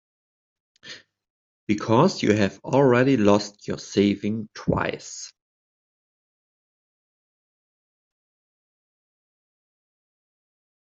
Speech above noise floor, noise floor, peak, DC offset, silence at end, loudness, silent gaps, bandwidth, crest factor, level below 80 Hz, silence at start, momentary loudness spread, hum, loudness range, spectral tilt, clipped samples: over 69 dB; under -90 dBFS; -4 dBFS; under 0.1%; 5.55 s; -22 LUFS; 1.30-1.67 s; 7.8 kHz; 22 dB; -58 dBFS; 0.85 s; 22 LU; none; 12 LU; -6 dB/octave; under 0.1%